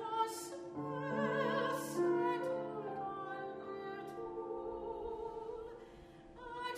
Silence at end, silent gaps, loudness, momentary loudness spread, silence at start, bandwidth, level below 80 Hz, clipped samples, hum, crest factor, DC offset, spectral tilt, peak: 0 s; none; -40 LUFS; 14 LU; 0 s; 15.5 kHz; -66 dBFS; under 0.1%; none; 16 dB; under 0.1%; -5 dB/octave; -24 dBFS